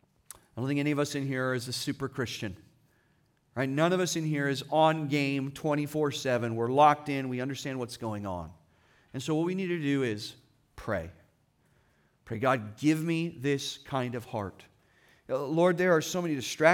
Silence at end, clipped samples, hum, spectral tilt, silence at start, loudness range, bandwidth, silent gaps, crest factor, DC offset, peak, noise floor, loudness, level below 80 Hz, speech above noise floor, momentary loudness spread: 0 s; under 0.1%; none; -5.5 dB/octave; 0.55 s; 6 LU; 18 kHz; none; 22 dB; under 0.1%; -8 dBFS; -69 dBFS; -30 LUFS; -66 dBFS; 40 dB; 13 LU